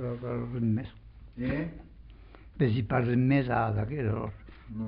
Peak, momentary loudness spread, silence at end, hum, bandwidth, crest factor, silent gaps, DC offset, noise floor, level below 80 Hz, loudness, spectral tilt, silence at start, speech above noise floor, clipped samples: -14 dBFS; 18 LU; 0 s; none; 5.2 kHz; 16 dB; none; under 0.1%; -50 dBFS; -50 dBFS; -30 LUFS; -7.5 dB/octave; 0 s; 21 dB; under 0.1%